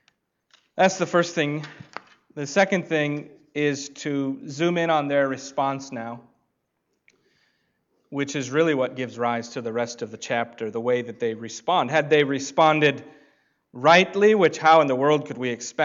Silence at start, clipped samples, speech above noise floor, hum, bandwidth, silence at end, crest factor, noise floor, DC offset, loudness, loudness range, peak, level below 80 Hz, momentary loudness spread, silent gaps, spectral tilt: 0.75 s; under 0.1%; 53 dB; none; 7.8 kHz; 0 s; 18 dB; -75 dBFS; under 0.1%; -22 LUFS; 9 LU; -6 dBFS; -74 dBFS; 17 LU; none; -4.5 dB/octave